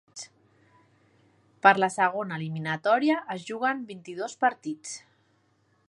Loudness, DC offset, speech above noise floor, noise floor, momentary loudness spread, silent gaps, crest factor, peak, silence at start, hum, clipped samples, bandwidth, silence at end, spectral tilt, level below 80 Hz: -26 LUFS; under 0.1%; 41 dB; -68 dBFS; 19 LU; none; 26 dB; -4 dBFS; 0.15 s; none; under 0.1%; 11.5 kHz; 0.9 s; -4.5 dB/octave; -80 dBFS